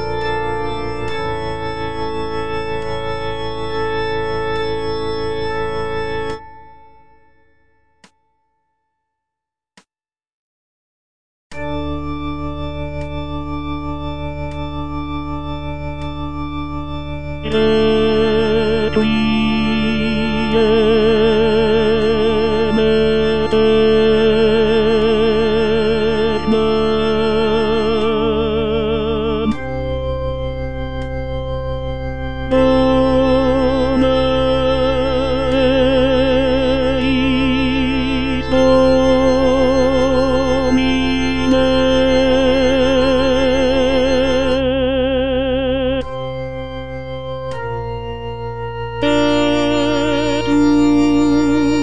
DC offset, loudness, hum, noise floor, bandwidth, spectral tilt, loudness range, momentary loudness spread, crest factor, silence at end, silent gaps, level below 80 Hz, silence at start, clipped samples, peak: 4%; -17 LUFS; none; under -90 dBFS; 10 kHz; -6.5 dB/octave; 11 LU; 12 LU; 14 dB; 0 s; 10.33-11.50 s; -30 dBFS; 0 s; under 0.1%; -2 dBFS